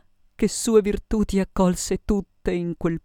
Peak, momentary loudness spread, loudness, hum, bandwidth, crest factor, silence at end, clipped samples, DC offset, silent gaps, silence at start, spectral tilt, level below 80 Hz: -4 dBFS; 7 LU; -23 LUFS; none; 17 kHz; 18 dB; 0.05 s; under 0.1%; under 0.1%; none; 0.4 s; -5.5 dB/octave; -36 dBFS